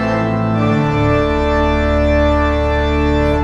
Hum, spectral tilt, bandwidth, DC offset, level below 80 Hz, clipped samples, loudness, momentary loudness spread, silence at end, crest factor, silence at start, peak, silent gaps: none; -7.5 dB/octave; 7.4 kHz; under 0.1%; -20 dBFS; under 0.1%; -15 LUFS; 2 LU; 0 s; 12 dB; 0 s; -2 dBFS; none